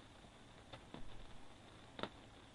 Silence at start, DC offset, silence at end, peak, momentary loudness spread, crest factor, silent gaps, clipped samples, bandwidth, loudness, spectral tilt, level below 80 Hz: 0 s; under 0.1%; 0 s; -22 dBFS; 11 LU; 30 dB; none; under 0.1%; 11 kHz; -56 LUFS; -4.5 dB/octave; -64 dBFS